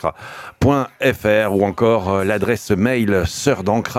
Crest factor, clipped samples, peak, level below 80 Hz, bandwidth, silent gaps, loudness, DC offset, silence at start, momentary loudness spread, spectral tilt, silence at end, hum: 16 dB; under 0.1%; -2 dBFS; -40 dBFS; 16.5 kHz; none; -17 LUFS; under 0.1%; 0.05 s; 4 LU; -6 dB/octave; 0 s; none